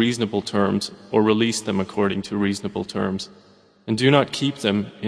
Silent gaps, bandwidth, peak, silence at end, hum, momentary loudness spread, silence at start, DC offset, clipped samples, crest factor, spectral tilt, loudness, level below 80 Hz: none; 11 kHz; -2 dBFS; 0 s; none; 10 LU; 0 s; under 0.1%; under 0.1%; 20 dB; -5 dB/octave; -22 LUFS; -58 dBFS